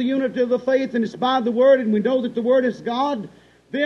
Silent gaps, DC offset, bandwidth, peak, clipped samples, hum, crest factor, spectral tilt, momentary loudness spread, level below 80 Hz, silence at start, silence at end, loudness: none; under 0.1%; 6.8 kHz; -6 dBFS; under 0.1%; none; 14 dB; -6.5 dB/octave; 9 LU; -64 dBFS; 0 s; 0 s; -20 LUFS